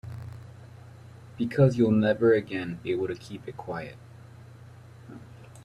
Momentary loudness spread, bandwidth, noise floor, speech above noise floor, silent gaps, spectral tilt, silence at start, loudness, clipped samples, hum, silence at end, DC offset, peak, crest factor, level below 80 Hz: 27 LU; 11.5 kHz; -48 dBFS; 23 dB; none; -8 dB/octave; 0.05 s; -26 LUFS; under 0.1%; none; 0 s; under 0.1%; -8 dBFS; 20 dB; -60 dBFS